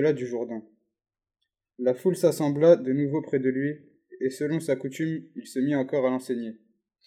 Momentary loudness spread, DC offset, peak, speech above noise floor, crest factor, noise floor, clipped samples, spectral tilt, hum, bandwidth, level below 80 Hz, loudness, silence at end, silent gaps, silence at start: 13 LU; under 0.1%; -6 dBFS; 57 dB; 20 dB; -83 dBFS; under 0.1%; -7 dB/octave; none; 14.5 kHz; -78 dBFS; -26 LUFS; 0.5 s; none; 0 s